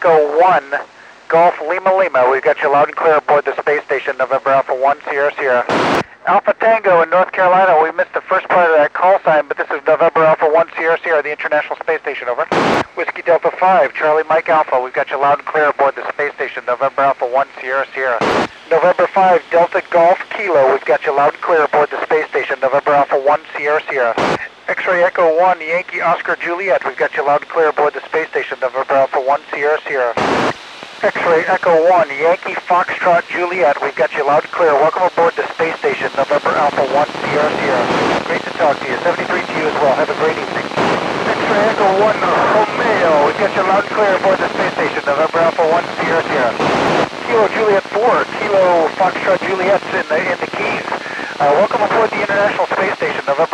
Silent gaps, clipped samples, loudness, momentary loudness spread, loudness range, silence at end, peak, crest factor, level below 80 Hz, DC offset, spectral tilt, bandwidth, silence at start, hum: none; under 0.1%; -14 LUFS; 6 LU; 3 LU; 0 s; -2 dBFS; 12 dB; -56 dBFS; under 0.1%; -5 dB/octave; 10.5 kHz; 0 s; none